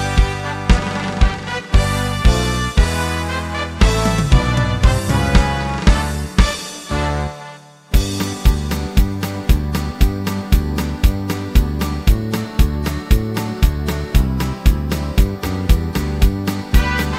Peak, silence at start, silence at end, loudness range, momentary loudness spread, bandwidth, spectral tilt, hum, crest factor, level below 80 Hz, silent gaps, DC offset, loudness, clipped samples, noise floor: 0 dBFS; 0 s; 0 s; 3 LU; 6 LU; 16.5 kHz; -5.5 dB/octave; none; 16 dB; -18 dBFS; none; under 0.1%; -18 LUFS; under 0.1%; -38 dBFS